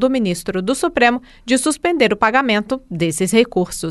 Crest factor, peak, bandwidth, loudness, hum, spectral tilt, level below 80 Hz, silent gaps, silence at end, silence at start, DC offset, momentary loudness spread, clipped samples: 16 dB; -2 dBFS; 12.5 kHz; -17 LUFS; none; -4 dB/octave; -46 dBFS; none; 0 s; 0 s; under 0.1%; 6 LU; under 0.1%